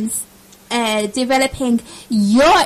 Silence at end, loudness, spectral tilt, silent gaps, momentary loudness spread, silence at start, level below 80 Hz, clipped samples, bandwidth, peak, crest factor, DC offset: 0 s; -17 LUFS; -3.5 dB/octave; none; 10 LU; 0 s; -44 dBFS; under 0.1%; 15 kHz; -4 dBFS; 12 dB; under 0.1%